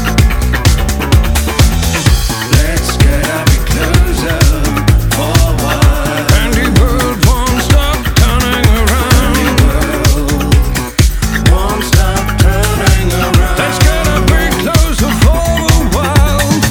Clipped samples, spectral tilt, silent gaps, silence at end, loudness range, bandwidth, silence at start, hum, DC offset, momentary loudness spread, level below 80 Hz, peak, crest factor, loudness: 0.2%; -4.5 dB/octave; none; 0 s; 1 LU; 19 kHz; 0 s; none; under 0.1%; 2 LU; -12 dBFS; 0 dBFS; 10 dB; -11 LUFS